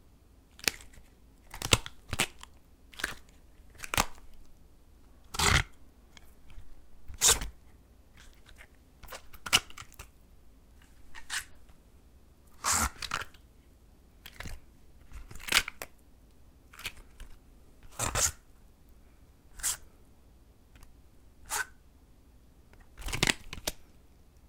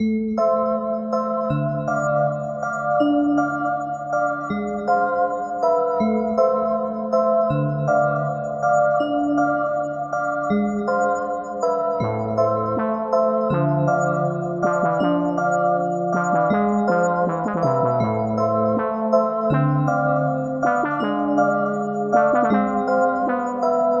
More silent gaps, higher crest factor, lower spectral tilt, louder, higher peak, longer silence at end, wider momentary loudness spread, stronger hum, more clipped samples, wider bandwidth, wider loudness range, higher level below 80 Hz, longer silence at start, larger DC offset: neither; first, 34 dB vs 16 dB; second, -1.5 dB/octave vs -8 dB/octave; second, -30 LUFS vs -21 LUFS; about the same, -2 dBFS vs -4 dBFS; first, 0.25 s vs 0 s; first, 26 LU vs 5 LU; neither; neither; first, 18 kHz vs 7.4 kHz; first, 8 LU vs 2 LU; first, -48 dBFS vs -56 dBFS; first, 0.6 s vs 0 s; neither